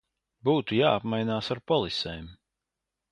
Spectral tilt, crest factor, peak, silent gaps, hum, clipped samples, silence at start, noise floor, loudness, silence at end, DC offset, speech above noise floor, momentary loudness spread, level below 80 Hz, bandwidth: -6.5 dB/octave; 20 dB; -8 dBFS; none; none; under 0.1%; 0.45 s; -86 dBFS; -27 LUFS; 0.75 s; under 0.1%; 60 dB; 8 LU; -56 dBFS; 10.5 kHz